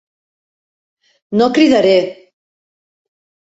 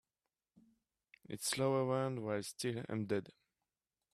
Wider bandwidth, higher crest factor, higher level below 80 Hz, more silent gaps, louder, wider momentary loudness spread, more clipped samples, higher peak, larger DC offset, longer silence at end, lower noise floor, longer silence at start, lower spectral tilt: second, 8 kHz vs 15 kHz; about the same, 16 dB vs 20 dB; first, -60 dBFS vs -78 dBFS; neither; first, -12 LUFS vs -38 LUFS; first, 10 LU vs 7 LU; neither; first, -2 dBFS vs -20 dBFS; neither; first, 1.4 s vs 0.85 s; about the same, under -90 dBFS vs under -90 dBFS; about the same, 1.3 s vs 1.3 s; about the same, -5.5 dB/octave vs -5 dB/octave